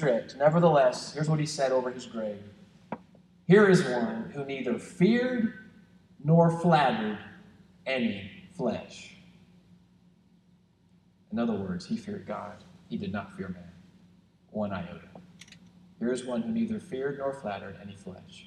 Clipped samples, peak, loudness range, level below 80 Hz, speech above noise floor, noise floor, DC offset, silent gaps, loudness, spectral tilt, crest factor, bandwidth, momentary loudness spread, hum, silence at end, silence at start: under 0.1%; -8 dBFS; 12 LU; -66 dBFS; 36 dB; -63 dBFS; under 0.1%; none; -28 LUFS; -6.5 dB/octave; 22 dB; 11 kHz; 21 LU; 60 Hz at -50 dBFS; 0.05 s; 0 s